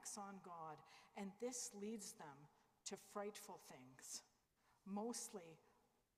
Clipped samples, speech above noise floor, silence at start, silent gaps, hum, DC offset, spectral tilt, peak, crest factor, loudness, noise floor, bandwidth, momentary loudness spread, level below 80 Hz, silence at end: under 0.1%; 28 dB; 0 s; none; none; under 0.1%; -3 dB/octave; -36 dBFS; 18 dB; -53 LUFS; -81 dBFS; 15.5 kHz; 13 LU; under -90 dBFS; 0.4 s